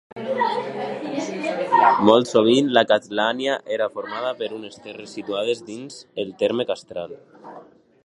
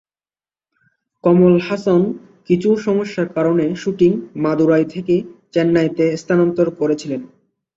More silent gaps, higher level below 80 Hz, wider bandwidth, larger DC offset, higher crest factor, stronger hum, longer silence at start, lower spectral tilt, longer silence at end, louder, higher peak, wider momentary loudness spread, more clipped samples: neither; second, -68 dBFS vs -56 dBFS; first, 11.5 kHz vs 7.6 kHz; neither; first, 22 dB vs 16 dB; neither; second, 0.15 s vs 1.25 s; second, -4.5 dB/octave vs -8 dB/octave; about the same, 0.4 s vs 0.5 s; second, -21 LUFS vs -17 LUFS; about the same, 0 dBFS vs -2 dBFS; first, 19 LU vs 8 LU; neither